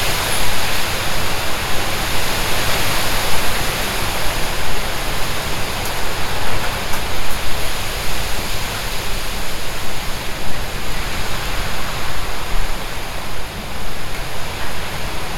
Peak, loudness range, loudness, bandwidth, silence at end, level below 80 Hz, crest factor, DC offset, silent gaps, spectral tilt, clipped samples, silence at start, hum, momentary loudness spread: -2 dBFS; 6 LU; -22 LUFS; 17 kHz; 0 s; -26 dBFS; 14 dB; under 0.1%; none; -2.5 dB/octave; under 0.1%; 0 s; none; 8 LU